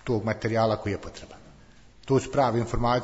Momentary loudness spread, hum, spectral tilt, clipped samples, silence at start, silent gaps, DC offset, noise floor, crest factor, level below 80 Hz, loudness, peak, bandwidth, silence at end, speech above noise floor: 17 LU; none; -6.5 dB/octave; under 0.1%; 0.05 s; none; under 0.1%; -52 dBFS; 16 dB; -44 dBFS; -26 LUFS; -12 dBFS; 8 kHz; 0 s; 27 dB